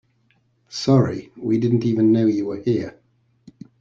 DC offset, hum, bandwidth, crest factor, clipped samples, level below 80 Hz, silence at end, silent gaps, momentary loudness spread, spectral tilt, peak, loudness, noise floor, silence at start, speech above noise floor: under 0.1%; none; 7.6 kHz; 18 dB; under 0.1%; -58 dBFS; 0.9 s; none; 11 LU; -7.5 dB/octave; -4 dBFS; -20 LUFS; -63 dBFS; 0.7 s; 44 dB